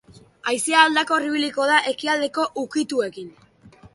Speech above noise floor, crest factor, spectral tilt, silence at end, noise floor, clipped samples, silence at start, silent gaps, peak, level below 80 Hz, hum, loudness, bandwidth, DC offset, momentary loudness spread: 28 dB; 20 dB; -1.5 dB/octave; 0.1 s; -49 dBFS; under 0.1%; 0.45 s; none; -2 dBFS; -66 dBFS; none; -21 LUFS; 11.5 kHz; under 0.1%; 14 LU